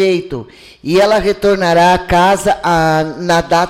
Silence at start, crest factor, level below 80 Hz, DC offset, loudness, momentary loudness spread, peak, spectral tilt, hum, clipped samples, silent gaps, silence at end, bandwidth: 0 s; 10 dB; -36 dBFS; under 0.1%; -12 LUFS; 8 LU; -2 dBFS; -5 dB/octave; none; under 0.1%; none; 0 s; 16.5 kHz